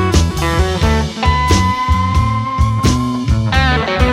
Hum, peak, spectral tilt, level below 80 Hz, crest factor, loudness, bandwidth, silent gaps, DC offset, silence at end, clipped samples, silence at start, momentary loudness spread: none; 0 dBFS; -5.5 dB/octave; -20 dBFS; 12 dB; -14 LUFS; 15 kHz; none; under 0.1%; 0 s; under 0.1%; 0 s; 3 LU